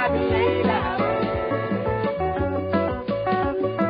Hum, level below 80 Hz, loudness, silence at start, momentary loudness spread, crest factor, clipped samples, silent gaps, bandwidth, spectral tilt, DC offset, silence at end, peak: none; -40 dBFS; -23 LUFS; 0 s; 4 LU; 12 dB; under 0.1%; none; 5.2 kHz; -10.5 dB/octave; under 0.1%; 0 s; -10 dBFS